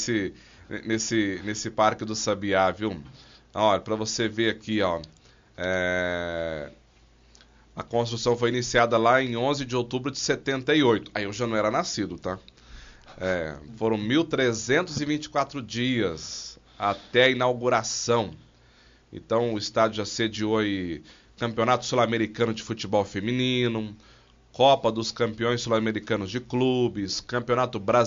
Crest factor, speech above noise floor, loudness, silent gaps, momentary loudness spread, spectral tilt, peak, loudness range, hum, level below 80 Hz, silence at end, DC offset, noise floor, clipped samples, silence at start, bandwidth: 20 dB; 32 dB; -26 LUFS; none; 12 LU; -3.5 dB/octave; -6 dBFS; 4 LU; none; -56 dBFS; 0 s; under 0.1%; -57 dBFS; under 0.1%; 0 s; 7.4 kHz